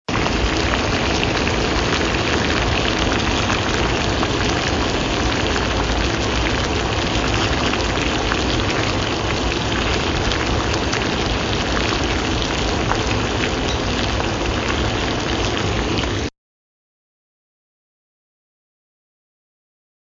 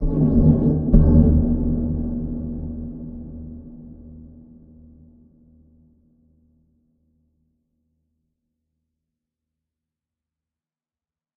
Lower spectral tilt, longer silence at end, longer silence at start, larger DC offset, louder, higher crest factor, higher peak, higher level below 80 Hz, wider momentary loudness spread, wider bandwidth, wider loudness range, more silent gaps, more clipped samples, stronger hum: second, -4 dB/octave vs -14.5 dB/octave; second, 3.75 s vs 7.1 s; about the same, 0.1 s vs 0 s; neither; about the same, -19 LUFS vs -19 LUFS; about the same, 18 dB vs 22 dB; about the same, -2 dBFS vs 0 dBFS; about the same, -28 dBFS vs -28 dBFS; second, 2 LU vs 26 LU; first, 7.6 kHz vs 1.8 kHz; second, 4 LU vs 24 LU; neither; neither; neither